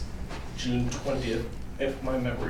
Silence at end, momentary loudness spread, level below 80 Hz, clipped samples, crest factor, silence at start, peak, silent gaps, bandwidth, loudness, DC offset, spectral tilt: 0 s; 9 LU; -38 dBFS; under 0.1%; 14 dB; 0 s; -16 dBFS; none; 16.5 kHz; -32 LUFS; under 0.1%; -5.5 dB/octave